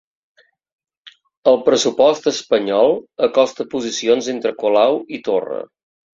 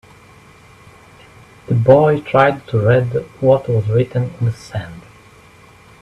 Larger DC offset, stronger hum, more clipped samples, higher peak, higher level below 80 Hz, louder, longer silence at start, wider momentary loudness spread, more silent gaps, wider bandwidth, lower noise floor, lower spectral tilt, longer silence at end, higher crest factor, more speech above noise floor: neither; neither; neither; about the same, -2 dBFS vs 0 dBFS; second, -62 dBFS vs -48 dBFS; about the same, -17 LUFS vs -15 LUFS; second, 1.05 s vs 1.7 s; second, 8 LU vs 14 LU; first, 1.37-1.43 s vs none; second, 7.8 kHz vs 9.8 kHz; about the same, -48 dBFS vs -45 dBFS; second, -3.5 dB/octave vs -8.5 dB/octave; second, 0.5 s vs 1 s; about the same, 16 dB vs 18 dB; about the same, 31 dB vs 30 dB